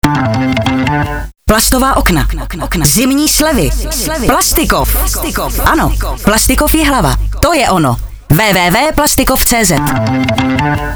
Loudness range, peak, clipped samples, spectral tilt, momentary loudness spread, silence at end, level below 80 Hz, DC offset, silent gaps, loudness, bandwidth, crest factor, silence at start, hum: 1 LU; 0 dBFS; under 0.1%; -4 dB/octave; 6 LU; 0 s; -18 dBFS; under 0.1%; none; -11 LUFS; over 20 kHz; 10 dB; 0.05 s; none